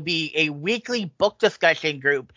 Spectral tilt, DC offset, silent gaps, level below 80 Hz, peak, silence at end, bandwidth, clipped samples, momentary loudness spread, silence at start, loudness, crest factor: -4 dB/octave; under 0.1%; none; -64 dBFS; -2 dBFS; 0.1 s; 7.6 kHz; under 0.1%; 5 LU; 0 s; -22 LUFS; 20 dB